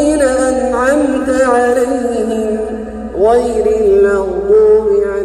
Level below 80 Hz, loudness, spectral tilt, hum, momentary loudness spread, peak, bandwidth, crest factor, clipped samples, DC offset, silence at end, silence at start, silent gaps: -34 dBFS; -12 LUFS; -5 dB/octave; none; 7 LU; 0 dBFS; 12.5 kHz; 10 dB; under 0.1%; under 0.1%; 0 s; 0 s; none